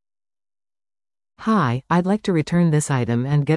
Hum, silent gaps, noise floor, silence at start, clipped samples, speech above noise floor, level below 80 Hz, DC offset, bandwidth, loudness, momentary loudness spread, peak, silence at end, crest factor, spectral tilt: none; none; under -90 dBFS; 1.4 s; under 0.1%; over 71 dB; -54 dBFS; under 0.1%; 12 kHz; -20 LUFS; 3 LU; -6 dBFS; 0 s; 14 dB; -6.5 dB/octave